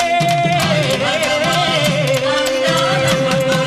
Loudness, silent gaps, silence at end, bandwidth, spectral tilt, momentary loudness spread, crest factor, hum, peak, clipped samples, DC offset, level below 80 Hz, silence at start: -15 LUFS; none; 0 s; 14 kHz; -4 dB/octave; 1 LU; 12 dB; none; -2 dBFS; under 0.1%; under 0.1%; -48 dBFS; 0 s